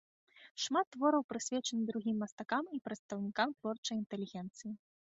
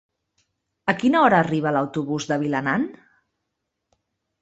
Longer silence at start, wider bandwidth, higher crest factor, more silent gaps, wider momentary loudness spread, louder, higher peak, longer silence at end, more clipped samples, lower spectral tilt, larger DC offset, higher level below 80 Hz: second, 0.35 s vs 0.85 s; about the same, 8 kHz vs 8.2 kHz; about the same, 20 dB vs 20 dB; first, 0.51-0.55 s, 0.87-0.91 s, 1.24-1.29 s, 2.32-2.38 s, 2.99-3.09 s, 3.78-3.83 s, 4.06-4.10 s vs none; about the same, 12 LU vs 10 LU; second, -37 LUFS vs -21 LUFS; second, -18 dBFS vs -4 dBFS; second, 0.3 s vs 1.5 s; neither; second, -3.5 dB/octave vs -6 dB/octave; neither; second, -82 dBFS vs -62 dBFS